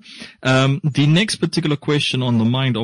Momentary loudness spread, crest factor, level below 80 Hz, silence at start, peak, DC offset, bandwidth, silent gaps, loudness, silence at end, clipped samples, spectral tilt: 5 LU; 12 dB; -54 dBFS; 0.1 s; -6 dBFS; under 0.1%; 11 kHz; none; -17 LUFS; 0 s; under 0.1%; -5.5 dB/octave